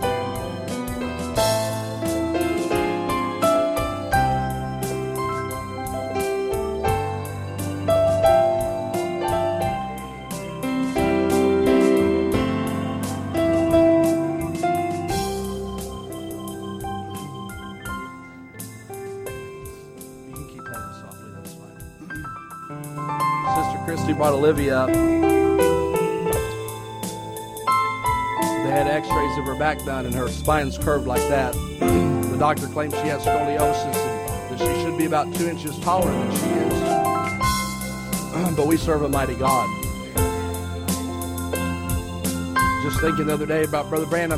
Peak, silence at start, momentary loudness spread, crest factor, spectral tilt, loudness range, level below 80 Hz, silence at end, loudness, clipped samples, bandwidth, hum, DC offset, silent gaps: -4 dBFS; 0 s; 15 LU; 18 dB; -5.5 dB/octave; 13 LU; -38 dBFS; 0 s; -23 LUFS; under 0.1%; 16 kHz; none; under 0.1%; none